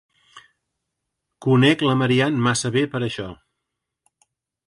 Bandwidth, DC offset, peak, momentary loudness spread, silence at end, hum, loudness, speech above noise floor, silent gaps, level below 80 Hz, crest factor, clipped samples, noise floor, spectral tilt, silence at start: 11.5 kHz; under 0.1%; -4 dBFS; 12 LU; 1.35 s; none; -19 LUFS; 62 dB; none; -58 dBFS; 18 dB; under 0.1%; -81 dBFS; -5.5 dB/octave; 0.35 s